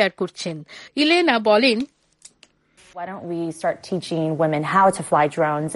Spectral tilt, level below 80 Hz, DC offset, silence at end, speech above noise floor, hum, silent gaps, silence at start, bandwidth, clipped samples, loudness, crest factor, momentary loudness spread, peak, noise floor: -5 dB/octave; -64 dBFS; under 0.1%; 0 s; 36 dB; none; none; 0 s; 11.5 kHz; under 0.1%; -20 LUFS; 18 dB; 15 LU; -4 dBFS; -57 dBFS